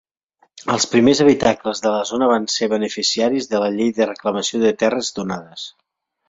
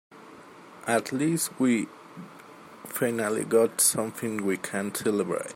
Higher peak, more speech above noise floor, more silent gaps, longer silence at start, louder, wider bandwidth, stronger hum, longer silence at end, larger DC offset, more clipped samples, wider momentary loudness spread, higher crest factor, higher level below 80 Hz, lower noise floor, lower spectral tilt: first, -2 dBFS vs -10 dBFS; first, 44 dB vs 22 dB; neither; first, 0.55 s vs 0.1 s; first, -18 LUFS vs -26 LUFS; second, 8 kHz vs 16.5 kHz; neither; first, 0.6 s vs 0 s; neither; neither; second, 13 LU vs 20 LU; about the same, 18 dB vs 18 dB; first, -56 dBFS vs -72 dBFS; first, -61 dBFS vs -48 dBFS; about the same, -4 dB/octave vs -4 dB/octave